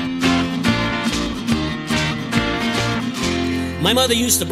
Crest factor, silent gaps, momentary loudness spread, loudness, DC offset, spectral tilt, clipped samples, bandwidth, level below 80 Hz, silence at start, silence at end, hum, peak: 18 dB; none; 6 LU; -19 LUFS; under 0.1%; -3.5 dB/octave; under 0.1%; 16 kHz; -36 dBFS; 0 s; 0 s; none; -2 dBFS